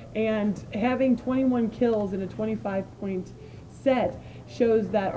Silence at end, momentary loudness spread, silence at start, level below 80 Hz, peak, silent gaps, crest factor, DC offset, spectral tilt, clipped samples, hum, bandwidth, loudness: 0 s; 13 LU; 0 s; -52 dBFS; -10 dBFS; none; 16 dB; under 0.1%; -8 dB/octave; under 0.1%; none; 8 kHz; -26 LUFS